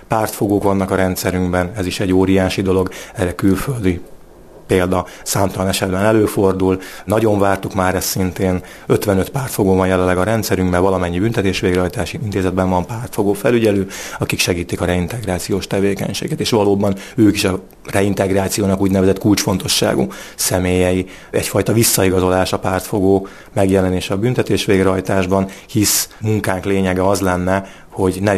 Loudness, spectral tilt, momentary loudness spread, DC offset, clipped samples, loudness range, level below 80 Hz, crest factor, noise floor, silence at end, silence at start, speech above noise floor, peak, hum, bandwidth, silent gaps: -17 LUFS; -5 dB/octave; 7 LU; under 0.1%; under 0.1%; 2 LU; -40 dBFS; 16 dB; -40 dBFS; 0 s; 0 s; 24 dB; 0 dBFS; none; 14 kHz; none